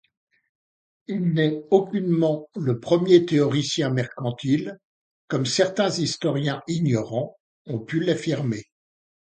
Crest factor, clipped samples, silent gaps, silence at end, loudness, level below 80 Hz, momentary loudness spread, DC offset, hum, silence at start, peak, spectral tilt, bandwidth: 20 dB; under 0.1%; 4.84-5.28 s, 7.40-7.65 s; 0.75 s; -23 LUFS; -64 dBFS; 10 LU; under 0.1%; none; 1.1 s; -4 dBFS; -6 dB/octave; 9.4 kHz